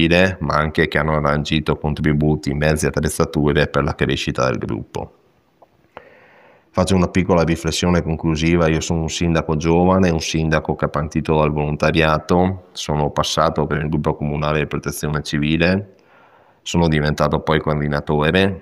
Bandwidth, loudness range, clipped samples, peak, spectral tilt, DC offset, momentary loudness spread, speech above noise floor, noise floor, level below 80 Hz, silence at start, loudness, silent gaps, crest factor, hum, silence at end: 14.5 kHz; 4 LU; under 0.1%; 0 dBFS; -5.5 dB/octave; under 0.1%; 6 LU; 37 dB; -54 dBFS; -34 dBFS; 0 s; -18 LUFS; none; 18 dB; none; 0 s